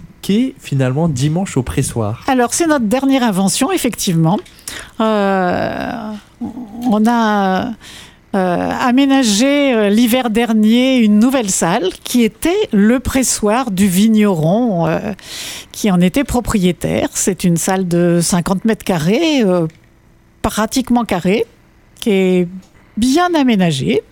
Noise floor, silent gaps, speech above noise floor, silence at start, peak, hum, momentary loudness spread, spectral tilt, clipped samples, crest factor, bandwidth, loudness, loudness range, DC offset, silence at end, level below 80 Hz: -48 dBFS; none; 34 dB; 0 s; 0 dBFS; none; 11 LU; -5 dB/octave; under 0.1%; 14 dB; 18 kHz; -14 LUFS; 4 LU; under 0.1%; 0.1 s; -38 dBFS